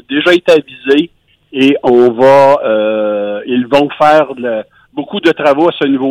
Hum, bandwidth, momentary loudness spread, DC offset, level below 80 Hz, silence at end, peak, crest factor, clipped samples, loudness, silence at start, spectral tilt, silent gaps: none; 11.5 kHz; 12 LU; under 0.1%; -52 dBFS; 0 s; 0 dBFS; 10 dB; under 0.1%; -10 LUFS; 0.1 s; -6 dB/octave; none